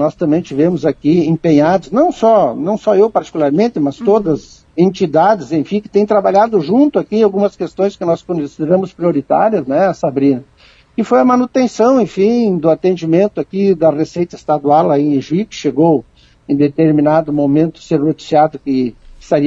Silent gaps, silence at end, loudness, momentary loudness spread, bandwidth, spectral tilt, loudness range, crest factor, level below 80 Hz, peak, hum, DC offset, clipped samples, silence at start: none; 0 s; -13 LUFS; 6 LU; 7.8 kHz; -7.5 dB/octave; 2 LU; 12 dB; -50 dBFS; 0 dBFS; none; under 0.1%; under 0.1%; 0 s